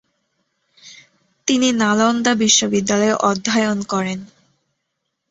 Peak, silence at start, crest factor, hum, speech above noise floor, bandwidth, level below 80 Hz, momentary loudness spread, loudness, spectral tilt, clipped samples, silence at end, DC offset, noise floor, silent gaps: -2 dBFS; 0.85 s; 18 dB; none; 58 dB; 8 kHz; -60 dBFS; 9 LU; -17 LUFS; -3 dB/octave; under 0.1%; 1.05 s; under 0.1%; -75 dBFS; none